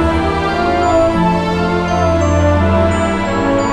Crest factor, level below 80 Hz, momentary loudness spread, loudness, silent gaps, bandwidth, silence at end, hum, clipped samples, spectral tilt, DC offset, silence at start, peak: 12 dB; -26 dBFS; 3 LU; -14 LUFS; none; 10 kHz; 0 s; none; under 0.1%; -6.5 dB/octave; under 0.1%; 0 s; 0 dBFS